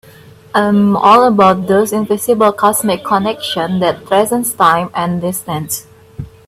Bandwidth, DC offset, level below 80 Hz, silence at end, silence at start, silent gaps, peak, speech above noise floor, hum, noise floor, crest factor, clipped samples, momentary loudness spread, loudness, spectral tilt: 16 kHz; under 0.1%; -50 dBFS; 0.2 s; 0.55 s; none; 0 dBFS; 27 dB; none; -40 dBFS; 14 dB; under 0.1%; 11 LU; -13 LUFS; -4.5 dB/octave